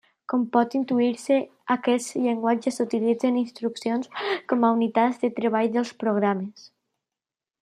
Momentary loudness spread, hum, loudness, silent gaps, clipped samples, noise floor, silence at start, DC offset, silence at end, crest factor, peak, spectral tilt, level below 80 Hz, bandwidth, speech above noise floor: 6 LU; none; -24 LUFS; none; under 0.1%; -90 dBFS; 0.3 s; under 0.1%; 1 s; 18 dB; -6 dBFS; -5.5 dB/octave; -78 dBFS; 12.5 kHz; 66 dB